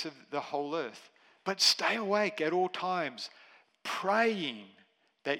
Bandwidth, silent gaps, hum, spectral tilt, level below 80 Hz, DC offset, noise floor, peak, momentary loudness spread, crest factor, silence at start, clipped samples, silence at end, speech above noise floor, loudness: 16 kHz; none; none; -2.5 dB/octave; under -90 dBFS; under 0.1%; -54 dBFS; -10 dBFS; 17 LU; 22 dB; 0 s; under 0.1%; 0 s; 22 dB; -31 LUFS